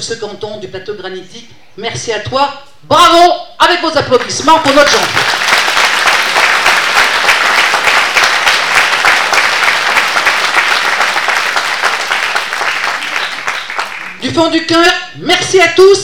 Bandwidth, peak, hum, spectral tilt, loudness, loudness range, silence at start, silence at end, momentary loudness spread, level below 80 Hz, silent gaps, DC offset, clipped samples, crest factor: 19.5 kHz; 0 dBFS; none; -2 dB/octave; -9 LUFS; 5 LU; 0 s; 0 s; 12 LU; -46 dBFS; none; 2%; 0.6%; 10 dB